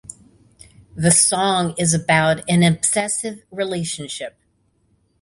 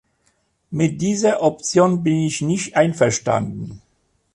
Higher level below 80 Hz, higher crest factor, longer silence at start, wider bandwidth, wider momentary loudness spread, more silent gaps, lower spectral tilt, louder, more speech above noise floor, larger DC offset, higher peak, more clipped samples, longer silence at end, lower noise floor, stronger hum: about the same, -52 dBFS vs -54 dBFS; about the same, 20 dB vs 16 dB; first, 0.95 s vs 0.7 s; about the same, 11.5 kHz vs 11.5 kHz; first, 16 LU vs 11 LU; neither; second, -3.5 dB/octave vs -5.5 dB/octave; about the same, -18 LUFS vs -19 LUFS; about the same, 45 dB vs 47 dB; neither; about the same, -2 dBFS vs -4 dBFS; neither; first, 0.95 s vs 0.55 s; about the same, -63 dBFS vs -65 dBFS; neither